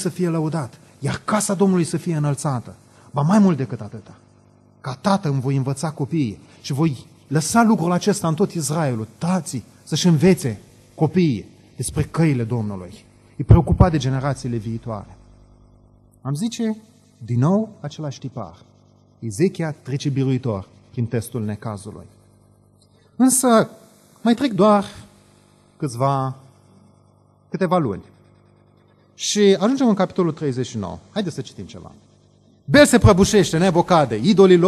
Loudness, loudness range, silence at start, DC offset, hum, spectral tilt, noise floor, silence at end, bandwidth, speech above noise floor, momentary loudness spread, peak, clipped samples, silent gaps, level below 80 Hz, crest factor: -20 LUFS; 6 LU; 0 s; under 0.1%; 50 Hz at -45 dBFS; -6 dB/octave; -55 dBFS; 0 s; 13 kHz; 36 dB; 18 LU; -2 dBFS; under 0.1%; none; -40 dBFS; 20 dB